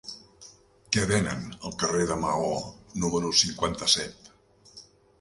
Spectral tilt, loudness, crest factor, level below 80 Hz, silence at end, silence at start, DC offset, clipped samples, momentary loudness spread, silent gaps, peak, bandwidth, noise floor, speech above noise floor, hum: -3 dB/octave; -26 LUFS; 24 dB; -50 dBFS; 0.4 s; 0.05 s; under 0.1%; under 0.1%; 15 LU; none; -4 dBFS; 11.5 kHz; -57 dBFS; 30 dB; none